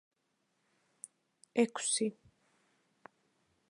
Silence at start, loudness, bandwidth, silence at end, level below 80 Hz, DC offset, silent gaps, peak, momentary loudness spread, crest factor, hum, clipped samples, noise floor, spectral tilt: 1.55 s; -33 LUFS; 11 kHz; 1.6 s; -86 dBFS; under 0.1%; none; -14 dBFS; 21 LU; 26 dB; none; under 0.1%; -80 dBFS; -2.5 dB/octave